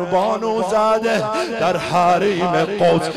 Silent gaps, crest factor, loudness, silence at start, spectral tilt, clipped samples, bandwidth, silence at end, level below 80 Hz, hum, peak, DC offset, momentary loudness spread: none; 10 dB; -17 LUFS; 0 s; -5.5 dB/octave; under 0.1%; 14.5 kHz; 0 s; -52 dBFS; none; -6 dBFS; under 0.1%; 4 LU